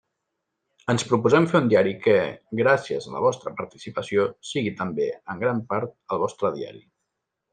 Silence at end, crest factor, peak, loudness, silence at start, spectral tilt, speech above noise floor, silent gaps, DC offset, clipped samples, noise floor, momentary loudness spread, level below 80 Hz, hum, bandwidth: 0.75 s; 20 dB; -4 dBFS; -24 LUFS; 0.9 s; -6 dB/octave; 57 dB; none; under 0.1%; under 0.1%; -81 dBFS; 14 LU; -66 dBFS; none; 9.6 kHz